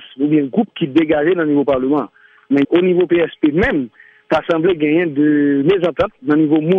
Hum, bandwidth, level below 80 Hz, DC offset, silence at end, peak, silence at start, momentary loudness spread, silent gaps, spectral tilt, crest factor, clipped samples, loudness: none; 5.2 kHz; -46 dBFS; under 0.1%; 0 s; -2 dBFS; 0 s; 5 LU; none; -8.5 dB/octave; 14 dB; under 0.1%; -15 LUFS